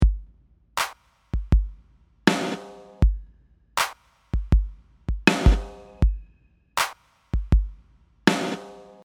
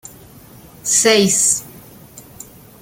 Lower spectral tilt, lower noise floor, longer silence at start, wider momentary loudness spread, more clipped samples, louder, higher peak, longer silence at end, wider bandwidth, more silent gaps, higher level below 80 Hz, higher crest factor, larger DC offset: first, -5 dB/octave vs -2 dB/octave; first, -59 dBFS vs -42 dBFS; second, 0 s vs 0.85 s; second, 16 LU vs 23 LU; neither; second, -25 LUFS vs -14 LUFS; about the same, 0 dBFS vs -2 dBFS; second, 0.25 s vs 0.6 s; about the same, 17.5 kHz vs 17 kHz; neither; first, -26 dBFS vs -54 dBFS; first, 24 dB vs 18 dB; neither